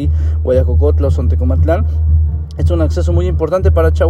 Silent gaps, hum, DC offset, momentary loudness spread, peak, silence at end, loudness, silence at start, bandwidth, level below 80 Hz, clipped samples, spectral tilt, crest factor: none; none; under 0.1%; 4 LU; 0 dBFS; 0 s; -14 LUFS; 0 s; 6.8 kHz; -18 dBFS; under 0.1%; -9 dB/octave; 12 dB